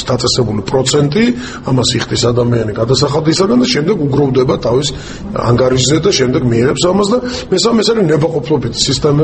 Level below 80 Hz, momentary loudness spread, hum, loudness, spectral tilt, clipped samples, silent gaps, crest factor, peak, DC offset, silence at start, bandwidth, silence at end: -34 dBFS; 5 LU; none; -12 LUFS; -5 dB/octave; under 0.1%; none; 12 dB; 0 dBFS; under 0.1%; 0 s; 8.8 kHz; 0 s